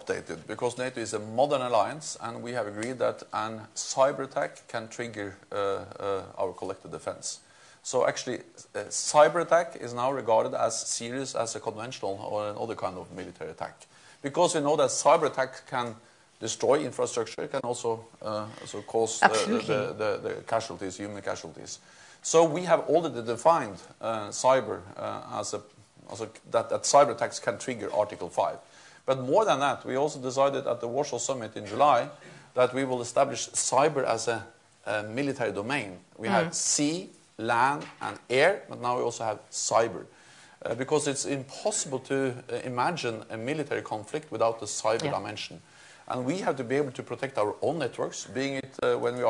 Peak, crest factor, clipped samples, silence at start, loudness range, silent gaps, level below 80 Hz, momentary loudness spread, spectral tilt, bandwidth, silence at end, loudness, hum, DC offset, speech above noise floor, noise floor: -2 dBFS; 26 dB; under 0.1%; 0 s; 5 LU; none; -74 dBFS; 14 LU; -3.5 dB/octave; 11 kHz; 0 s; -28 LUFS; none; under 0.1%; 23 dB; -52 dBFS